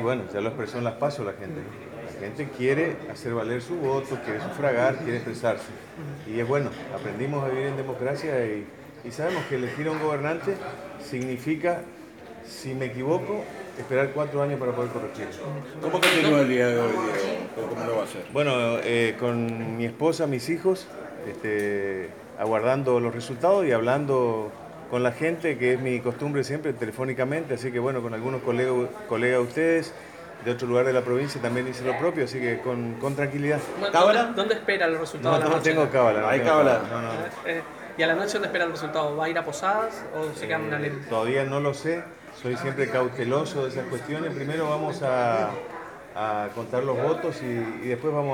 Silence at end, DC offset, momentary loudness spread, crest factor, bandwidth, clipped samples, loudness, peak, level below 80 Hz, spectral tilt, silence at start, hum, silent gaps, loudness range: 0 s; under 0.1%; 13 LU; 22 dB; 19 kHz; under 0.1%; -26 LUFS; -4 dBFS; -64 dBFS; -5.5 dB/octave; 0 s; none; none; 6 LU